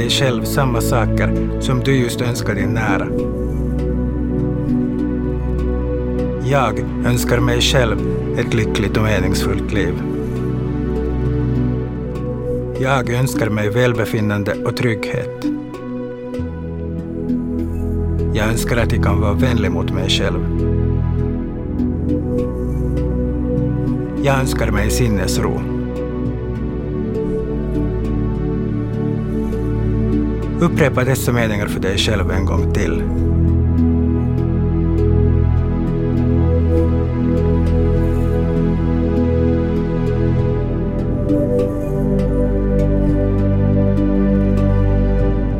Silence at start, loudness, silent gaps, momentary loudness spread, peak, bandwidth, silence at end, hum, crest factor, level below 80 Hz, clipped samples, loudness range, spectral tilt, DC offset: 0 s; -18 LUFS; none; 6 LU; -2 dBFS; 17 kHz; 0 s; none; 16 dB; -24 dBFS; under 0.1%; 4 LU; -6.5 dB/octave; under 0.1%